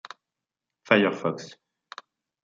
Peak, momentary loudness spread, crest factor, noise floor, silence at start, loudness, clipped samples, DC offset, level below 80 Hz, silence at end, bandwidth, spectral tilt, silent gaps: -2 dBFS; 24 LU; 26 dB; -88 dBFS; 0.9 s; -24 LUFS; under 0.1%; under 0.1%; -78 dBFS; 0.95 s; 7.6 kHz; -5.5 dB/octave; none